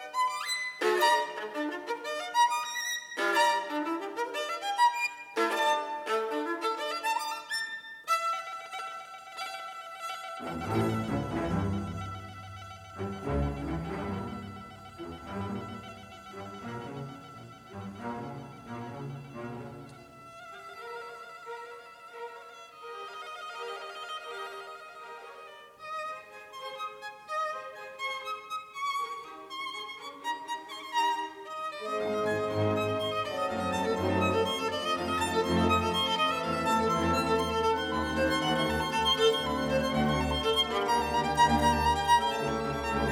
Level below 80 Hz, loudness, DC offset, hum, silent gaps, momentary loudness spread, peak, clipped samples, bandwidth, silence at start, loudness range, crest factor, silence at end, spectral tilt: -50 dBFS; -30 LUFS; under 0.1%; none; none; 18 LU; -12 dBFS; under 0.1%; 17 kHz; 0 s; 15 LU; 20 dB; 0 s; -4 dB/octave